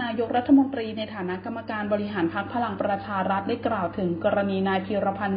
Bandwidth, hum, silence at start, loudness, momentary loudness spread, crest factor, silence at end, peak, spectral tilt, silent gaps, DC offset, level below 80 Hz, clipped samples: 5.2 kHz; none; 0 s; -26 LUFS; 11 LU; 16 dB; 0 s; -8 dBFS; -11 dB/octave; none; under 0.1%; -56 dBFS; under 0.1%